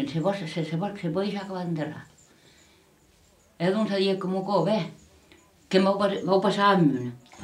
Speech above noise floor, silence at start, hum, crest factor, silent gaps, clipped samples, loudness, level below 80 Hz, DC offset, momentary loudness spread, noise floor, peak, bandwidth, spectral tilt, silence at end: 35 dB; 0 s; none; 18 dB; none; under 0.1%; -26 LUFS; -66 dBFS; under 0.1%; 11 LU; -60 dBFS; -8 dBFS; 11.5 kHz; -6.5 dB/octave; 0 s